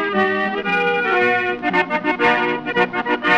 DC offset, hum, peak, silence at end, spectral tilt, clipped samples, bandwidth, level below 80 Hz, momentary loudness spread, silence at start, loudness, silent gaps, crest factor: 0.2%; none; -4 dBFS; 0 s; -5.5 dB/octave; under 0.1%; 9 kHz; -56 dBFS; 3 LU; 0 s; -18 LUFS; none; 14 dB